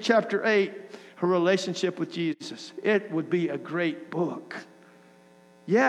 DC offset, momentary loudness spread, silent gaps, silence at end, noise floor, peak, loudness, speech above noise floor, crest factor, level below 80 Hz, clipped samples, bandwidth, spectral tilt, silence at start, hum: under 0.1%; 16 LU; none; 0 s; -55 dBFS; -8 dBFS; -27 LUFS; 29 dB; 18 dB; -86 dBFS; under 0.1%; 10.5 kHz; -5.5 dB/octave; 0 s; none